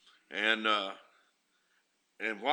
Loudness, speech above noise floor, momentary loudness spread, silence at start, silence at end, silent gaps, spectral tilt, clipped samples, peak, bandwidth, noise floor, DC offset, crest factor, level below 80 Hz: -32 LUFS; 43 dB; 13 LU; 0.3 s; 0 s; none; -2.5 dB/octave; under 0.1%; -10 dBFS; 20 kHz; -75 dBFS; under 0.1%; 24 dB; under -90 dBFS